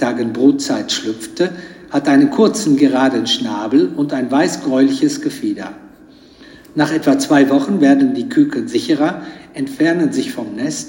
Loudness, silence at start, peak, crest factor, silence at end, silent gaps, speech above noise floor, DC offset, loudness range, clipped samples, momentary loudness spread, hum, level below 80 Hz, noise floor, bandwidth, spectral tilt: -15 LUFS; 0 s; 0 dBFS; 14 dB; 0 s; none; 28 dB; under 0.1%; 3 LU; under 0.1%; 11 LU; none; -58 dBFS; -43 dBFS; 16.5 kHz; -4.5 dB/octave